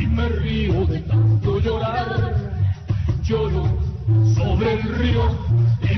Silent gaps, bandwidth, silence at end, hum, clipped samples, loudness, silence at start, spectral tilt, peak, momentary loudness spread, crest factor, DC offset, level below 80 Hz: none; 6.2 kHz; 0 s; none; under 0.1%; -20 LUFS; 0 s; -8.5 dB/octave; -8 dBFS; 5 LU; 10 dB; under 0.1%; -28 dBFS